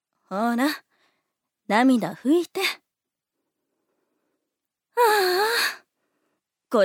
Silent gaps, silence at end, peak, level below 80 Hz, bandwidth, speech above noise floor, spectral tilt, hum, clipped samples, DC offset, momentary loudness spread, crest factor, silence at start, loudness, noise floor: none; 0 s; -6 dBFS; -88 dBFS; 18 kHz; 64 dB; -3.5 dB/octave; none; under 0.1%; under 0.1%; 13 LU; 20 dB; 0.3 s; -22 LUFS; -85 dBFS